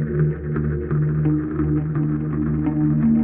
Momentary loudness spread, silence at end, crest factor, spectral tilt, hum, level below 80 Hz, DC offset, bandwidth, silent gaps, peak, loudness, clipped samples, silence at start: 4 LU; 0 s; 12 dB; -15 dB/octave; none; -34 dBFS; under 0.1%; 2.7 kHz; none; -8 dBFS; -21 LUFS; under 0.1%; 0 s